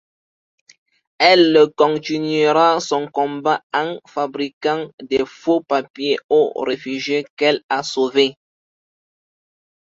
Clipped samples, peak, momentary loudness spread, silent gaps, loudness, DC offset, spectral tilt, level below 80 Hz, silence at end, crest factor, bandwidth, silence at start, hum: under 0.1%; 0 dBFS; 10 LU; 3.63-3.70 s, 4.53-4.61 s, 4.94-4.98 s, 5.90-5.94 s, 6.24-6.29 s, 7.30-7.37 s, 7.63-7.69 s; -18 LUFS; under 0.1%; -4.5 dB/octave; -64 dBFS; 1.5 s; 18 dB; 7.8 kHz; 1.2 s; none